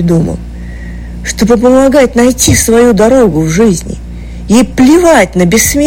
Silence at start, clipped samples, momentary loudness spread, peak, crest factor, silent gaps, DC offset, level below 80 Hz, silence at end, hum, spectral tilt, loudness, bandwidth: 0 s; 0.4%; 18 LU; 0 dBFS; 8 dB; none; under 0.1%; -24 dBFS; 0 s; none; -5 dB/octave; -7 LUFS; 17 kHz